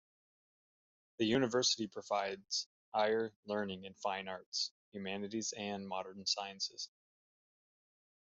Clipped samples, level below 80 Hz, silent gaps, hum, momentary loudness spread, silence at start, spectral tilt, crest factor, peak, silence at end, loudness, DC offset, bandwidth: under 0.1%; -80 dBFS; 2.66-2.92 s, 3.36-3.43 s, 4.46-4.52 s, 4.71-4.92 s; none; 10 LU; 1.2 s; -2.5 dB/octave; 20 dB; -20 dBFS; 1.4 s; -38 LUFS; under 0.1%; 8 kHz